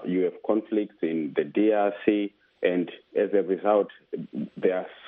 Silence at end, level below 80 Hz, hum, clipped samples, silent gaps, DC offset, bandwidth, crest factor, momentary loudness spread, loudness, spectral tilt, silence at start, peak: 0 s; -72 dBFS; none; under 0.1%; none; under 0.1%; 4 kHz; 18 dB; 10 LU; -26 LUFS; -10 dB/octave; 0 s; -8 dBFS